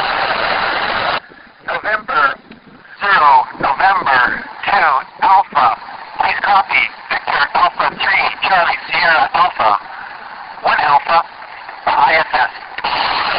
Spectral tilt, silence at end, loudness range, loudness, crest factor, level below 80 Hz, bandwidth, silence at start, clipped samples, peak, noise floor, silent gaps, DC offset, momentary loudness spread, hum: -6 dB/octave; 0 s; 2 LU; -14 LUFS; 14 dB; -48 dBFS; 5.6 kHz; 0 s; under 0.1%; 0 dBFS; -40 dBFS; none; under 0.1%; 11 LU; none